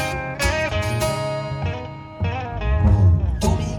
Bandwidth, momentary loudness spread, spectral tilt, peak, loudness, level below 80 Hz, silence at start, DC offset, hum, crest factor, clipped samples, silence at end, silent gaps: 17 kHz; 11 LU; -6 dB/octave; -6 dBFS; -21 LUFS; -28 dBFS; 0 s; under 0.1%; none; 14 dB; under 0.1%; 0 s; none